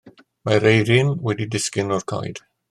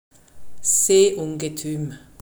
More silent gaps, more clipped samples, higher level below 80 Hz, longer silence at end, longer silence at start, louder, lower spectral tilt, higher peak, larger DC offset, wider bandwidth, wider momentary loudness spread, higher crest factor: neither; neither; about the same, -56 dBFS vs -56 dBFS; first, 0.35 s vs 0 s; about the same, 0.05 s vs 0.1 s; about the same, -20 LUFS vs -20 LUFS; first, -5 dB/octave vs -3.5 dB/octave; first, -2 dBFS vs -6 dBFS; neither; second, 13 kHz vs over 20 kHz; about the same, 15 LU vs 14 LU; about the same, 18 dB vs 16 dB